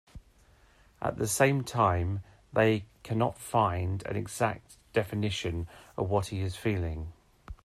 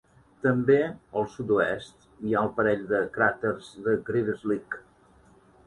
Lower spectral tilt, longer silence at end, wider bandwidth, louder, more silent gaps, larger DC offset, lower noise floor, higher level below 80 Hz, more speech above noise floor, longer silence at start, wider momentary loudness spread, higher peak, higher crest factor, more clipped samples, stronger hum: second, -5.5 dB/octave vs -7.5 dB/octave; second, 0.1 s vs 0.85 s; first, 14.5 kHz vs 11 kHz; second, -30 LUFS vs -27 LUFS; neither; neither; about the same, -61 dBFS vs -58 dBFS; first, -52 dBFS vs -60 dBFS; about the same, 32 dB vs 32 dB; second, 0.15 s vs 0.45 s; about the same, 12 LU vs 10 LU; about the same, -10 dBFS vs -8 dBFS; about the same, 20 dB vs 18 dB; neither; neither